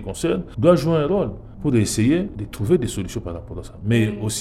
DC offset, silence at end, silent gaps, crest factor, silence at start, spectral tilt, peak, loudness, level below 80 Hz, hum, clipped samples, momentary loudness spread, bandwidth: under 0.1%; 0 s; none; 18 dB; 0 s; -6 dB/octave; -2 dBFS; -21 LUFS; -40 dBFS; none; under 0.1%; 13 LU; 15 kHz